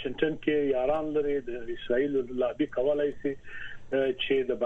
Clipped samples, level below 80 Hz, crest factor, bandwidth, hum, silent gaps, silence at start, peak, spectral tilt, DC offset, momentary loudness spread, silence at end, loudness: under 0.1%; -52 dBFS; 18 dB; 6.4 kHz; none; none; 0 s; -12 dBFS; -7 dB/octave; under 0.1%; 10 LU; 0 s; -29 LUFS